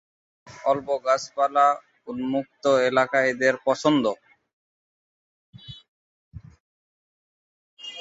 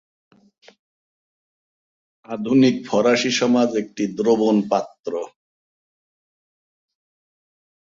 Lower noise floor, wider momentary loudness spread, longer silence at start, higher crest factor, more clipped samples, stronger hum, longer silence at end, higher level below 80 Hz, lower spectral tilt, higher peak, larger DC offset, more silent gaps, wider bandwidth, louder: about the same, under -90 dBFS vs under -90 dBFS; first, 19 LU vs 13 LU; second, 0.45 s vs 2.3 s; about the same, 20 dB vs 20 dB; neither; neither; second, 0 s vs 2.65 s; about the same, -62 dBFS vs -66 dBFS; about the same, -4.5 dB/octave vs -5 dB/octave; about the same, -6 dBFS vs -4 dBFS; neither; first, 4.53-5.53 s, 5.88-6.31 s, 6.60-7.77 s vs 4.99-5.03 s; about the same, 8 kHz vs 7.6 kHz; second, -23 LUFS vs -19 LUFS